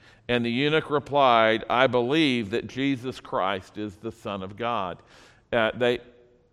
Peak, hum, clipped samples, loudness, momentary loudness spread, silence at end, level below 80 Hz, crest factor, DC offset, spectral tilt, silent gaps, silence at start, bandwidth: -4 dBFS; none; under 0.1%; -25 LUFS; 14 LU; 0.5 s; -58 dBFS; 22 dB; under 0.1%; -6 dB/octave; none; 0.3 s; 12.5 kHz